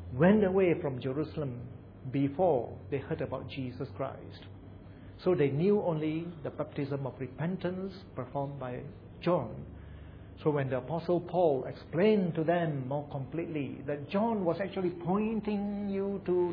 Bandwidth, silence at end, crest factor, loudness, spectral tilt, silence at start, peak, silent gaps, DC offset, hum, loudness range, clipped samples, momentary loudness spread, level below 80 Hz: 5.2 kHz; 0 s; 20 dB; -32 LUFS; -10.5 dB/octave; 0 s; -12 dBFS; none; under 0.1%; none; 5 LU; under 0.1%; 18 LU; -58 dBFS